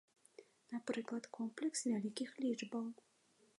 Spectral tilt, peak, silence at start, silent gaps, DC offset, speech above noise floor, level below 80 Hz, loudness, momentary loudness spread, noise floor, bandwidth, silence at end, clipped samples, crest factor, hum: -4 dB/octave; -26 dBFS; 0.4 s; none; under 0.1%; 22 dB; under -90 dBFS; -43 LUFS; 13 LU; -64 dBFS; 11 kHz; 0.65 s; under 0.1%; 18 dB; none